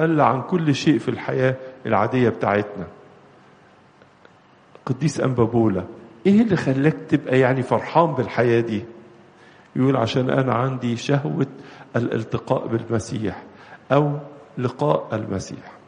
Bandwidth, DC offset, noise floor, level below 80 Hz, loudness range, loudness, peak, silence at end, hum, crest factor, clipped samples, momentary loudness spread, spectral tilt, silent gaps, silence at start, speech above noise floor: 10 kHz; under 0.1%; -52 dBFS; -58 dBFS; 6 LU; -21 LUFS; -2 dBFS; 0.1 s; none; 20 dB; under 0.1%; 11 LU; -7 dB/octave; none; 0 s; 31 dB